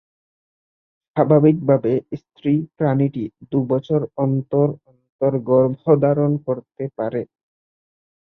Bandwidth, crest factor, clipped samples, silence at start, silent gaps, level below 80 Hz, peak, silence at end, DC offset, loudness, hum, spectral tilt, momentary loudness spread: 4.1 kHz; 18 dB; under 0.1%; 1.15 s; 5.09-5.19 s; -60 dBFS; -2 dBFS; 1.05 s; under 0.1%; -19 LUFS; none; -12 dB/octave; 12 LU